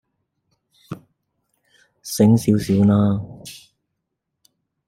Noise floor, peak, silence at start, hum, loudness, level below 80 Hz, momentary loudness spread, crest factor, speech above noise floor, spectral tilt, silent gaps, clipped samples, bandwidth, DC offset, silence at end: -78 dBFS; -2 dBFS; 0.9 s; none; -17 LUFS; -56 dBFS; 22 LU; 20 dB; 62 dB; -7 dB/octave; none; under 0.1%; 16 kHz; under 0.1%; 1.35 s